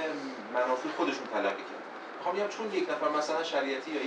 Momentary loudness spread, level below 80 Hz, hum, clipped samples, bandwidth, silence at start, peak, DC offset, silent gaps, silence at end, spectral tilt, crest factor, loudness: 9 LU; under -90 dBFS; none; under 0.1%; 10 kHz; 0 s; -16 dBFS; under 0.1%; none; 0 s; -3.5 dB/octave; 16 dB; -32 LUFS